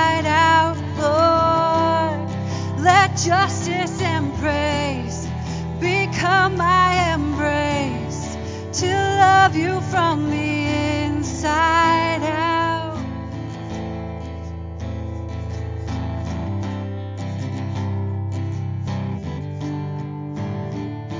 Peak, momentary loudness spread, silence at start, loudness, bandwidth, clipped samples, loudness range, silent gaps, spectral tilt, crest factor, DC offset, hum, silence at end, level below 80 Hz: -2 dBFS; 14 LU; 0 s; -20 LUFS; 7.6 kHz; under 0.1%; 10 LU; none; -5 dB/octave; 18 dB; under 0.1%; none; 0 s; -36 dBFS